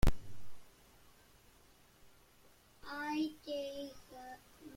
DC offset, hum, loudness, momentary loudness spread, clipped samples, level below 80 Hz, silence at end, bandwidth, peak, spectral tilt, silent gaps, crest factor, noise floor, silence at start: under 0.1%; none; -43 LUFS; 27 LU; under 0.1%; -46 dBFS; 0 s; 16.5 kHz; -18 dBFS; -6 dB/octave; none; 22 dB; -65 dBFS; 0 s